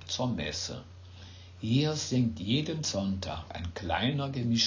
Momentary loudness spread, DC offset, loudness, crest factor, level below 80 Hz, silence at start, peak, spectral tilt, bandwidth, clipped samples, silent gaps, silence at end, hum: 19 LU; under 0.1%; -31 LUFS; 18 dB; -48 dBFS; 0 s; -14 dBFS; -4.5 dB/octave; 7.6 kHz; under 0.1%; none; 0 s; none